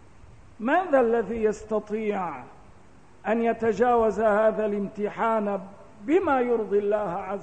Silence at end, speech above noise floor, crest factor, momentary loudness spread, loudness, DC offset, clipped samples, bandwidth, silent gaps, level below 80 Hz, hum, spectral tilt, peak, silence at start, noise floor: 0 s; 30 dB; 14 dB; 11 LU; -25 LUFS; 0.3%; under 0.1%; 8.8 kHz; none; -56 dBFS; none; -7 dB/octave; -10 dBFS; 0.6 s; -54 dBFS